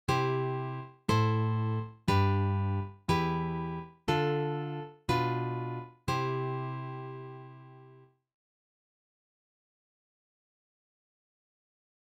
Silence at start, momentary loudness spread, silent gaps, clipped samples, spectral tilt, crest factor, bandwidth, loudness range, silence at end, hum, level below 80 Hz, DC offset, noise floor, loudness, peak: 0.1 s; 12 LU; none; under 0.1%; -7 dB/octave; 20 dB; 16 kHz; 12 LU; 4.05 s; none; -58 dBFS; under 0.1%; -58 dBFS; -32 LUFS; -14 dBFS